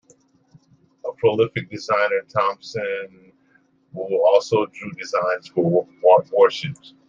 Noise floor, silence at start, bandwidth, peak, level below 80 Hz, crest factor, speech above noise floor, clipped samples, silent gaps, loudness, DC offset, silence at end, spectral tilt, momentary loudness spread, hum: -60 dBFS; 1.05 s; 7.6 kHz; -2 dBFS; -66 dBFS; 20 dB; 40 dB; under 0.1%; none; -20 LUFS; under 0.1%; 0.35 s; -6 dB/octave; 16 LU; none